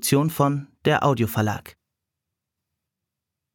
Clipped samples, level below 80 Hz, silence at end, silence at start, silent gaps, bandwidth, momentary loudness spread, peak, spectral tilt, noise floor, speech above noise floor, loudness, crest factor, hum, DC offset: under 0.1%; -60 dBFS; 1.85 s; 0 s; none; 19 kHz; 6 LU; -6 dBFS; -5.5 dB/octave; -84 dBFS; 63 dB; -22 LUFS; 20 dB; none; under 0.1%